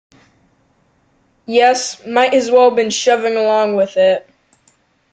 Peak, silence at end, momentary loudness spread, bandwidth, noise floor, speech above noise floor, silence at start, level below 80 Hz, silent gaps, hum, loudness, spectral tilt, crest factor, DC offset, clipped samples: -2 dBFS; 0.95 s; 7 LU; 9.2 kHz; -58 dBFS; 45 dB; 1.5 s; -64 dBFS; none; none; -14 LUFS; -2.5 dB/octave; 14 dB; under 0.1%; under 0.1%